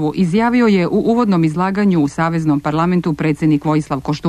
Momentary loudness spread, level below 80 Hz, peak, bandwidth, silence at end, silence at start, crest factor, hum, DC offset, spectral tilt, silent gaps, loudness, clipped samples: 4 LU; -44 dBFS; -4 dBFS; 11.5 kHz; 0 s; 0 s; 10 dB; none; under 0.1%; -7.5 dB/octave; none; -15 LUFS; under 0.1%